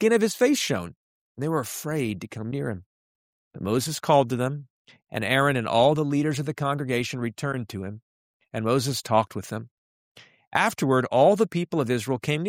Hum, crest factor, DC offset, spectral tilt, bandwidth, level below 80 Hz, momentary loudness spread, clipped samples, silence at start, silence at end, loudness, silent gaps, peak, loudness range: none; 20 dB; under 0.1%; -5 dB/octave; 16 kHz; -62 dBFS; 14 LU; under 0.1%; 0 s; 0 s; -25 LUFS; 0.96-1.35 s, 2.86-3.51 s, 4.70-4.85 s, 8.02-8.40 s, 9.71-10.15 s, 10.47-10.51 s; -4 dBFS; 5 LU